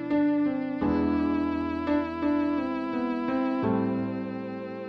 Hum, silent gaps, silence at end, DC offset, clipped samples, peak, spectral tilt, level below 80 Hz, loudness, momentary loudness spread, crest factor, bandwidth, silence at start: none; none; 0 s; under 0.1%; under 0.1%; -14 dBFS; -9 dB/octave; -52 dBFS; -28 LUFS; 6 LU; 12 dB; 5.6 kHz; 0 s